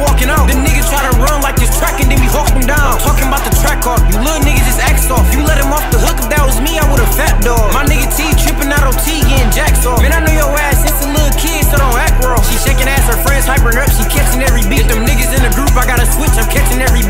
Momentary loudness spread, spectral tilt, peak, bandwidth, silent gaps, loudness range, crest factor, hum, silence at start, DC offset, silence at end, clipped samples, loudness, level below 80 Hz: 2 LU; -4 dB/octave; 0 dBFS; 16.5 kHz; none; 0 LU; 10 dB; none; 0 s; under 0.1%; 0 s; under 0.1%; -11 LUFS; -12 dBFS